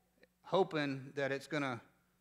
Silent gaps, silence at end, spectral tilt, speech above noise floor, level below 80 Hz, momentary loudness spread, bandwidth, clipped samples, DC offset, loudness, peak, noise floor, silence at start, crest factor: none; 0.4 s; -6 dB/octave; 25 dB; -84 dBFS; 6 LU; 13.5 kHz; under 0.1%; under 0.1%; -38 LUFS; -18 dBFS; -62 dBFS; 0.45 s; 20 dB